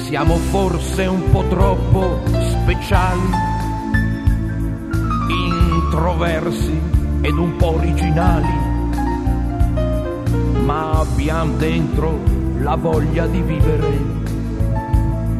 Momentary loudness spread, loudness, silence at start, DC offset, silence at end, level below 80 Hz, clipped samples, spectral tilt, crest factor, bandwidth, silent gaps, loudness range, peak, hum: 4 LU; -18 LUFS; 0 s; under 0.1%; 0 s; -20 dBFS; under 0.1%; -7 dB/octave; 16 dB; 13.5 kHz; none; 1 LU; 0 dBFS; none